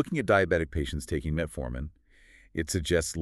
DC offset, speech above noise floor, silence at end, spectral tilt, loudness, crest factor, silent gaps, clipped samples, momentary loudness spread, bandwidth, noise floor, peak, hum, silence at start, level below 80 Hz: under 0.1%; 29 dB; 0 s; -5 dB/octave; -29 LUFS; 20 dB; none; under 0.1%; 14 LU; 13.5 kHz; -57 dBFS; -8 dBFS; none; 0 s; -40 dBFS